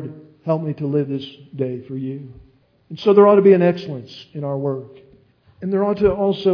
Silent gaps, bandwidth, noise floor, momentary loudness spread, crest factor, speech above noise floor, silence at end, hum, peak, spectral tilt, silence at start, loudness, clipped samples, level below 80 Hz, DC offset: none; 5.4 kHz; -53 dBFS; 20 LU; 18 dB; 35 dB; 0 s; none; -2 dBFS; -9.5 dB/octave; 0 s; -18 LUFS; under 0.1%; -52 dBFS; under 0.1%